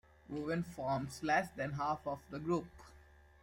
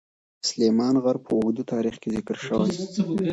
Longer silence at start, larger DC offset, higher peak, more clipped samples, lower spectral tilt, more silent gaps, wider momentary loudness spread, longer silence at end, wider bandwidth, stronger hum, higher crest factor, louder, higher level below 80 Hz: second, 0.3 s vs 0.45 s; neither; second, -20 dBFS vs -10 dBFS; neither; about the same, -6 dB/octave vs -5.5 dB/octave; neither; about the same, 9 LU vs 8 LU; first, 0.4 s vs 0 s; first, 16.5 kHz vs 8.2 kHz; neither; about the same, 18 dB vs 14 dB; second, -38 LUFS vs -25 LUFS; second, -64 dBFS vs -58 dBFS